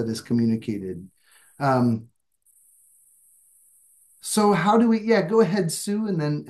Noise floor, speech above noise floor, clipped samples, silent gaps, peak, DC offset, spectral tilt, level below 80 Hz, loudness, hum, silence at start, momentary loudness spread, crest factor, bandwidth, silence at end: -63 dBFS; 41 dB; under 0.1%; none; -6 dBFS; under 0.1%; -6 dB/octave; -70 dBFS; -22 LUFS; none; 0 s; 13 LU; 18 dB; 12.5 kHz; 0 s